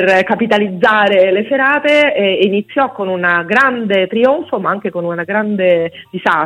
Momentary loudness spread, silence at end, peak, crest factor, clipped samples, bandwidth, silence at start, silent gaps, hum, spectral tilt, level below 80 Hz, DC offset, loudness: 7 LU; 0 s; 0 dBFS; 12 dB; under 0.1%; 10.5 kHz; 0 s; none; none; -6 dB/octave; -58 dBFS; under 0.1%; -13 LUFS